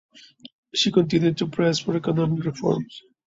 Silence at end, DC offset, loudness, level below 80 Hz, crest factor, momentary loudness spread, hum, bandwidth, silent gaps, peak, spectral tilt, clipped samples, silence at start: 0.25 s; under 0.1%; -23 LUFS; -60 dBFS; 18 dB; 7 LU; none; 7.8 kHz; 0.53-0.63 s; -6 dBFS; -5.5 dB/octave; under 0.1%; 0.45 s